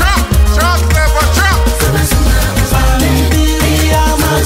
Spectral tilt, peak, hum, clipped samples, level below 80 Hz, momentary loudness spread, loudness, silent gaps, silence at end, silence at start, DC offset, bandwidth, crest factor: -4.5 dB/octave; 0 dBFS; none; under 0.1%; -12 dBFS; 2 LU; -11 LUFS; none; 0 s; 0 s; under 0.1%; 16.5 kHz; 10 dB